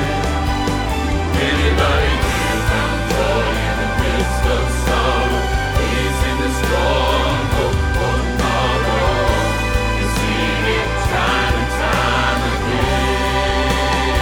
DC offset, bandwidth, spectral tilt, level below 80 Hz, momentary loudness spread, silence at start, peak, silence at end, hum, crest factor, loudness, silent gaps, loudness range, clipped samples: under 0.1%; 18 kHz; -5 dB/octave; -22 dBFS; 3 LU; 0 s; -2 dBFS; 0 s; none; 14 dB; -17 LUFS; none; 1 LU; under 0.1%